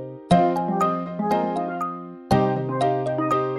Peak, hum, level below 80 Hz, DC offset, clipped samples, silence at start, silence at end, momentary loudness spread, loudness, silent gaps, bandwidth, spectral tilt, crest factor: -4 dBFS; none; -50 dBFS; under 0.1%; under 0.1%; 0 s; 0 s; 8 LU; -23 LUFS; none; 12.5 kHz; -7.5 dB/octave; 18 dB